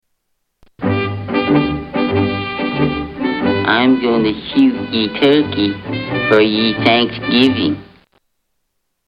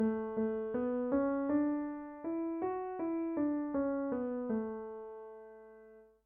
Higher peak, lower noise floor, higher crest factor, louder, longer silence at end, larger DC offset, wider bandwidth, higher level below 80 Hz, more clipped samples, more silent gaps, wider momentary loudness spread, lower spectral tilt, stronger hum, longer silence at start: first, 0 dBFS vs -22 dBFS; first, -69 dBFS vs -59 dBFS; about the same, 16 dB vs 14 dB; first, -15 LUFS vs -36 LUFS; first, 1.25 s vs 0.2 s; neither; first, 5.8 kHz vs 3.1 kHz; first, -44 dBFS vs -66 dBFS; neither; neither; second, 7 LU vs 16 LU; second, -7.5 dB/octave vs -9 dB/octave; neither; first, 0.8 s vs 0 s